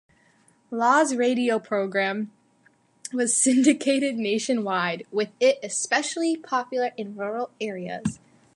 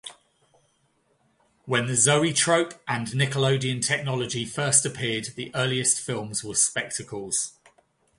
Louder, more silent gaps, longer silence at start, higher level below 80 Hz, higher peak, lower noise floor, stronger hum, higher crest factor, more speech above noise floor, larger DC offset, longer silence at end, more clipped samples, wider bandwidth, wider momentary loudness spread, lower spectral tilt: about the same, -24 LUFS vs -24 LUFS; neither; first, 0.7 s vs 0.05 s; about the same, -66 dBFS vs -62 dBFS; about the same, -6 dBFS vs -4 dBFS; second, -62 dBFS vs -68 dBFS; neither; about the same, 18 dB vs 22 dB; second, 38 dB vs 43 dB; neither; second, 0.4 s vs 0.7 s; neither; about the same, 11.5 kHz vs 11.5 kHz; about the same, 12 LU vs 10 LU; about the same, -3 dB/octave vs -3 dB/octave